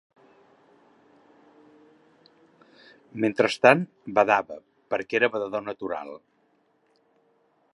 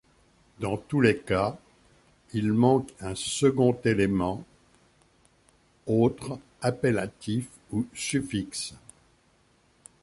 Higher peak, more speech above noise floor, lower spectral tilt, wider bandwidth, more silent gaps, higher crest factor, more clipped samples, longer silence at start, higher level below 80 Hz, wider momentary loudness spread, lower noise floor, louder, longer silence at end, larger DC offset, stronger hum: first, -2 dBFS vs -8 dBFS; first, 43 dB vs 38 dB; about the same, -5.5 dB/octave vs -5.5 dB/octave; about the same, 11.5 kHz vs 11.5 kHz; neither; first, 28 dB vs 22 dB; neither; first, 3.15 s vs 0.6 s; second, -74 dBFS vs -54 dBFS; first, 23 LU vs 13 LU; about the same, -67 dBFS vs -64 dBFS; first, -24 LUFS vs -27 LUFS; first, 1.55 s vs 1.25 s; neither; neither